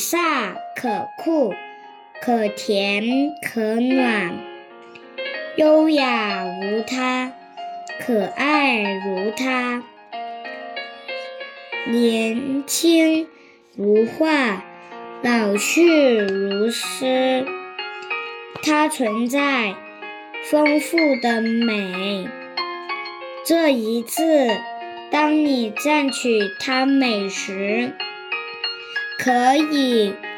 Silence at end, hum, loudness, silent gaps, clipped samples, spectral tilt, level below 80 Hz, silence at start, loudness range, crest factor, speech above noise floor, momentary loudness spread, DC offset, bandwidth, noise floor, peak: 0 s; none; -20 LUFS; none; under 0.1%; -3.5 dB/octave; -76 dBFS; 0 s; 3 LU; 16 dB; 23 dB; 15 LU; under 0.1%; 19 kHz; -42 dBFS; -4 dBFS